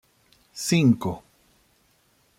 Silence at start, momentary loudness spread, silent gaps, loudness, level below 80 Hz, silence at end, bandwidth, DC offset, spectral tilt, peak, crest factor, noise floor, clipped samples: 0.55 s; 20 LU; none; -23 LUFS; -62 dBFS; 1.2 s; 16 kHz; under 0.1%; -5.5 dB/octave; -8 dBFS; 20 dB; -64 dBFS; under 0.1%